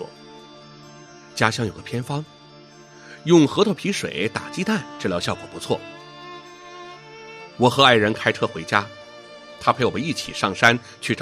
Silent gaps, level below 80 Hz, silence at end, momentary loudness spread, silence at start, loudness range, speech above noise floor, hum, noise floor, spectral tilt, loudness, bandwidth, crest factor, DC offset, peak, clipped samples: none; -60 dBFS; 0 s; 24 LU; 0 s; 7 LU; 25 dB; none; -46 dBFS; -4.5 dB/octave; -21 LUFS; 13.5 kHz; 22 dB; under 0.1%; 0 dBFS; under 0.1%